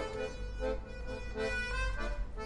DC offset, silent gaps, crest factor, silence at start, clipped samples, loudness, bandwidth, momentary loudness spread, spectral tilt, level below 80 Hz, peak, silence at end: under 0.1%; none; 14 dB; 0 s; under 0.1%; -38 LUFS; 11 kHz; 7 LU; -5 dB/octave; -40 dBFS; -22 dBFS; 0 s